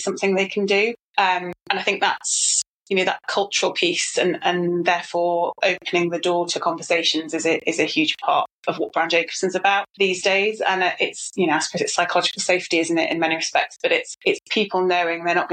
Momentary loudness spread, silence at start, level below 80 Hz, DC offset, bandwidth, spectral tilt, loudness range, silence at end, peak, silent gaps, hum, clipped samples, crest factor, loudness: 4 LU; 0 s; -72 dBFS; under 0.1%; 9.6 kHz; -2.5 dB/octave; 1 LU; 0 s; -2 dBFS; 1.01-1.14 s, 2.68-2.81 s, 8.52-8.63 s, 9.90-9.94 s; none; under 0.1%; 20 dB; -20 LUFS